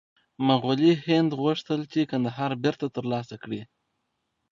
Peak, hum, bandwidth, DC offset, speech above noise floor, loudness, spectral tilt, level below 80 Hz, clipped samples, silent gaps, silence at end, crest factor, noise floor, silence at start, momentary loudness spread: -8 dBFS; none; 7.4 kHz; under 0.1%; 53 dB; -26 LUFS; -7 dB/octave; -68 dBFS; under 0.1%; none; 0.85 s; 20 dB; -78 dBFS; 0.4 s; 13 LU